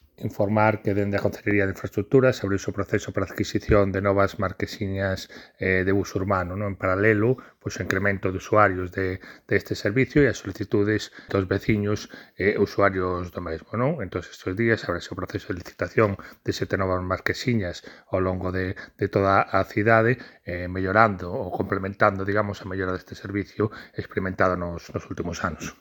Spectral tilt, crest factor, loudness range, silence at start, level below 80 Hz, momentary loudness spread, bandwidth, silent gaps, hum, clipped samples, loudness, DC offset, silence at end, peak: -6.5 dB/octave; 24 dB; 4 LU; 0.2 s; -48 dBFS; 12 LU; 19 kHz; none; none; under 0.1%; -25 LUFS; under 0.1%; 0.05 s; 0 dBFS